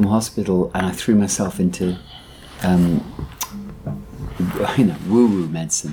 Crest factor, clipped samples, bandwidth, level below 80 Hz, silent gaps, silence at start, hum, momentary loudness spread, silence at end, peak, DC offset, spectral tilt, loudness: 16 dB; under 0.1%; 19.5 kHz; -42 dBFS; none; 0 s; none; 15 LU; 0 s; -4 dBFS; under 0.1%; -5.5 dB/octave; -20 LUFS